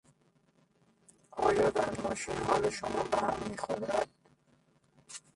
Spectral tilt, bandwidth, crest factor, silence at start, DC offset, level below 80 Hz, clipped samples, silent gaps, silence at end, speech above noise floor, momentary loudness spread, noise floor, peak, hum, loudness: -4.5 dB/octave; 11.5 kHz; 20 dB; 1.35 s; under 0.1%; -60 dBFS; under 0.1%; none; 0.15 s; 36 dB; 12 LU; -69 dBFS; -14 dBFS; none; -32 LUFS